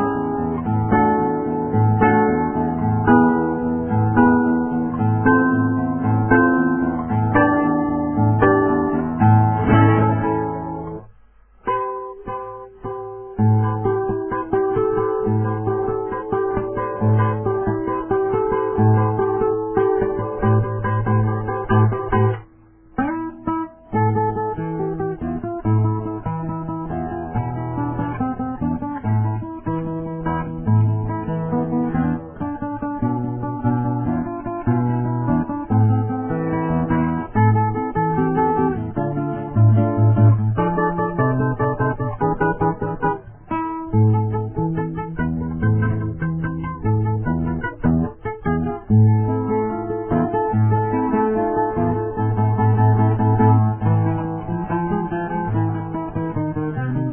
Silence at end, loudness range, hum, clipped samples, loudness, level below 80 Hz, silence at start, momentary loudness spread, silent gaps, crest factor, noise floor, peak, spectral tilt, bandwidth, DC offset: 0 s; 6 LU; none; under 0.1%; -20 LUFS; -40 dBFS; 0 s; 10 LU; none; 18 dB; -49 dBFS; 0 dBFS; -13 dB/octave; 3.2 kHz; under 0.1%